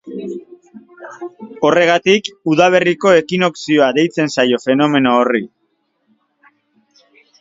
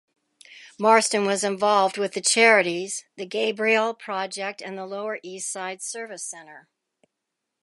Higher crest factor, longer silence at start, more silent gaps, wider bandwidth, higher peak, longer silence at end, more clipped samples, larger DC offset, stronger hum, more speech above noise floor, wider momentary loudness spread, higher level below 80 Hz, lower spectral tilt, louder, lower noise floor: second, 16 dB vs 22 dB; second, 0.05 s vs 0.5 s; neither; second, 7.8 kHz vs 11.5 kHz; first, 0 dBFS vs -4 dBFS; first, 1.95 s vs 1 s; neither; neither; neither; second, 52 dB vs 59 dB; first, 20 LU vs 15 LU; first, -60 dBFS vs -82 dBFS; first, -5 dB/octave vs -2 dB/octave; first, -14 LUFS vs -23 LUFS; second, -65 dBFS vs -82 dBFS